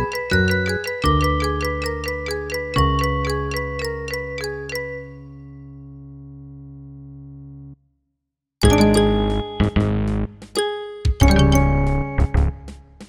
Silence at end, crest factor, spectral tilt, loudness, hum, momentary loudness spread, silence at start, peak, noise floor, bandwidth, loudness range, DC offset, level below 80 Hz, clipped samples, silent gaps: 0.05 s; 20 dB; -6 dB/octave; -20 LUFS; none; 24 LU; 0 s; 0 dBFS; -79 dBFS; 18.5 kHz; 16 LU; under 0.1%; -26 dBFS; under 0.1%; none